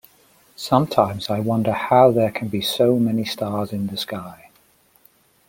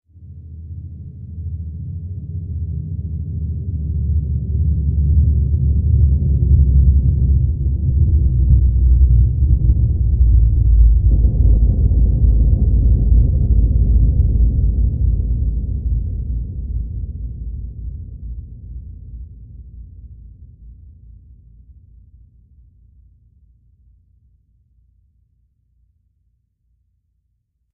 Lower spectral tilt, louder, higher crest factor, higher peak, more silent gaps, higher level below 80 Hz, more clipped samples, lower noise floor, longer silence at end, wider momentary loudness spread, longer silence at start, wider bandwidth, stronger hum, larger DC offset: second, -6 dB/octave vs -19.5 dB/octave; second, -20 LUFS vs -17 LUFS; first, 20 dB vs 14 dB; about the same, -2 dBFS vs -2 dBFS; neither; second, -58 dBFS vs -18 dBFS; neither; second, -58 dBFS vs -68 dBFS; second, 1.15 s vs 6.85 s; second, 13 LU vs 19 LU; first, 0.6 s vs 0.2 s; first, 17 kHz vs 0.8 kHz; neither; neither